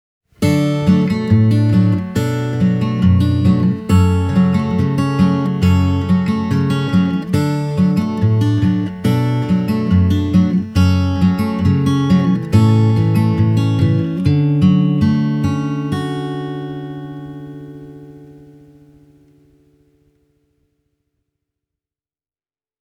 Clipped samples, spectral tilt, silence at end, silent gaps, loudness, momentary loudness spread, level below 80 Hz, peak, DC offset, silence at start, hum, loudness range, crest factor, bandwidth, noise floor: under 0.1%; -8 dB/octave; 4.5 s; none; -15 LUFS; 8 LU; -40 dBFS; 0 dBFS; under 0.1%; 0.4 s; none; 9 LU; 14 dB; 13.5 kHz; under -90 dBFS